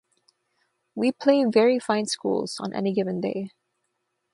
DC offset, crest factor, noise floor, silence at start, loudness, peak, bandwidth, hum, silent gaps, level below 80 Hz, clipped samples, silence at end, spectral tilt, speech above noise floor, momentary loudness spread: under 0.1%; 20 dB; -77 dBFS; 0.95 s; -24 LUFS; -6 dBFS; 11.5 kHz; none; none; -72 dBFS; under 0.1%; 0.85 s; -5 dB/octave; 54 dB; 11 LU